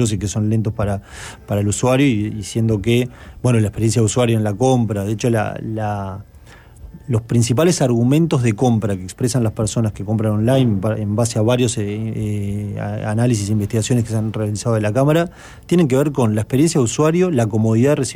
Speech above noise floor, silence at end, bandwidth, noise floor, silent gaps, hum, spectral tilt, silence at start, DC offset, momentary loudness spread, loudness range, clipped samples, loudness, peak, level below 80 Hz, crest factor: 25 dB; 0 s; 16 kHz; -42 dBFS; none; none; -6 dB/octave; 0 s; under 0.1%; 8 LU; 3 LU; under 0.1%; -18 LUFS; -4 dBFS; -42 dBFS; 12 dB